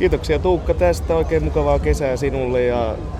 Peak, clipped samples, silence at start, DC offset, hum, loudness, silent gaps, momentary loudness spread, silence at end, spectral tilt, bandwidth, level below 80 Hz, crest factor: -4 dBFS; under 0.1%; 0 s; under 0.1%; none; -19 LUFS; none; 2 LU; 0 s; -7 dB/octave; 13.5 kHz; -26 dBFS; 14 dB